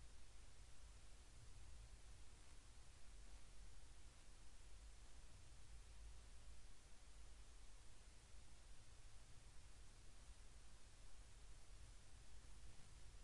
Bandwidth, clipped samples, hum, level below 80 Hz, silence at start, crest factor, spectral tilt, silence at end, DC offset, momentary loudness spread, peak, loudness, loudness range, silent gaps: 11.5 kHz; under 0.1%; none; -64 dBFS; 0 s; 12 dB; -3 dB/octave; 0 s; under 0.1%; 2 LU; -46 dBFS; -66 LUFS; 1 LU; none